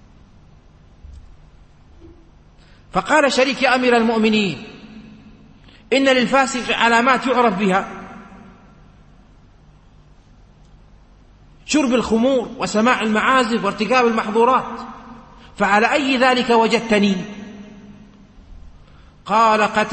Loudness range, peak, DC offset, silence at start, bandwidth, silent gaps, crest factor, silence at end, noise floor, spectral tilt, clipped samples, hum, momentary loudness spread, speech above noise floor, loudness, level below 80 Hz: 6 LU; -2 dBFS; under 0.1%; 1.05 s; 8.8 kHz; none; 18 dB; 0 s; -48 dBFS; -4 dB/octave; under 0.1%; none; 18 LU; 31 dB; -16 LUFS; -48 dBFS